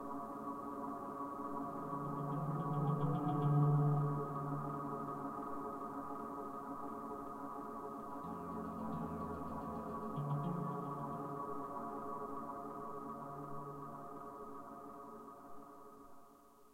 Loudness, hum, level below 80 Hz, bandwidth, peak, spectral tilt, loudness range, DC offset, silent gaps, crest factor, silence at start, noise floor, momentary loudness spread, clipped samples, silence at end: -42 LUFS; none; -68 dBFS; 15.5 kHz; -24 dBFS; -9.5 dB/octave; 11 LU; under 0.1%; none; 18 dB; 0 s; -63 dBFS; 14 LU; under 0.1%; 0 s